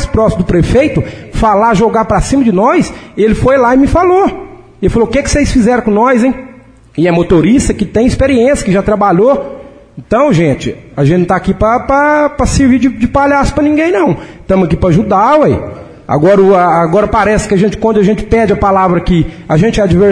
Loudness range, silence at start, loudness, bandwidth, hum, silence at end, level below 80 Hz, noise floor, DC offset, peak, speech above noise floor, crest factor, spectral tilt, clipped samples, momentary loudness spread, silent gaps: 2 LU; 0 s; -10 LUFS; 10.5 kHz; none; 0 s; -24 dBFS; -37 dBFS; under 0.1%; 0 dBFS; 28 dB; 10 dB; -6.5 dB/octave; under 0.1%; 6 LU; none